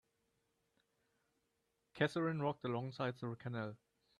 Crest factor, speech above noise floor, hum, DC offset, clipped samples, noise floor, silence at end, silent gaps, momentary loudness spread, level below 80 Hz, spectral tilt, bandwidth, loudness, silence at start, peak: 24 dB; 44 dB; none; under 0.1%; under 0.1%; -84 dBFS; 0.45 s; none; 9 LU; -80 dBFS; -7 dB/octave; 12 kHz; -41 LUFS; 1.95 s; -20 dBFS